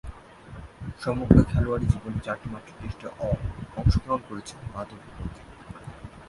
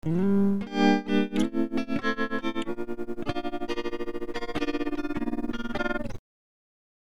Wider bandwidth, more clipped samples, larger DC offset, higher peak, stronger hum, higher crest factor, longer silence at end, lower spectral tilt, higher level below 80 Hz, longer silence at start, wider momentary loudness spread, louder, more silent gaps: about the same, 11.5 kHz vs 12 kHz; neither; second, under 0.1% vs 2%; first, 0 dBFS vs -10 dBFS; neither; first, 26 dB vs 20 dB; second, 0 s vs 0.8 s; first, -8 dB/octave vs -6.5 dB/octave; first, -34 dBFS vs -44 dBFS; about the same, 0.05 s vs 0 s; first, 25 LU vs 10 LU; first, -26 LUFS vs -29 LUFS; neither